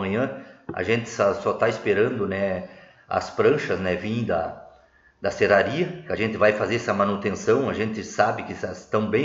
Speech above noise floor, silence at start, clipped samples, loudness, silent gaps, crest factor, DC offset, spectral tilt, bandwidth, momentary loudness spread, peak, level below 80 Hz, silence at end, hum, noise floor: 32 dB; 0 s; under 0.1%; -24 LUFS; none; 18 dB; under 0.1%; -6 dB/octave; 7.8 kHz; 10 LU; -4 dBFS; -58 dBFS; 0 s; none; -56 dBFS